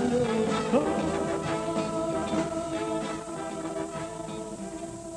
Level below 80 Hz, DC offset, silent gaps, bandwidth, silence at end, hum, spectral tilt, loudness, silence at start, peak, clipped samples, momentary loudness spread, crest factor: -54 dBFS; under 0.1%; none; 12.5 kHz; 0 s; none; -5.5 dB/octave; -30 LUFS; 0 s; -12 dBFS; under 0.1%; 11 LU; 18 dB